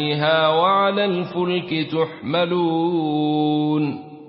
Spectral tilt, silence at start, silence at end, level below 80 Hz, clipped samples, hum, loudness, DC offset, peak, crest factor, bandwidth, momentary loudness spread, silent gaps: -11 dB/octave; 0 s; 0 s; -64 dBFS; under 0.1%; none; -20 LUFS; under 0.1%; -4 dBFS; 14 dB; 5.6 kHz; 6 LU; none